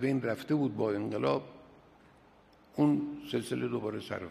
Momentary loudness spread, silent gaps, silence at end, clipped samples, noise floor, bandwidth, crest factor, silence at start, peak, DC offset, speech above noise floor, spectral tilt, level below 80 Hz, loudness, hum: 8 LU; none; 0 s; under 0.1%; -61 dBFS; 14 kHz; 18 dB; 0 s; -16 dBFS; under 0.1%; 29 dB; -7 dB/octave; -70 dBFS; -33 LUFS; none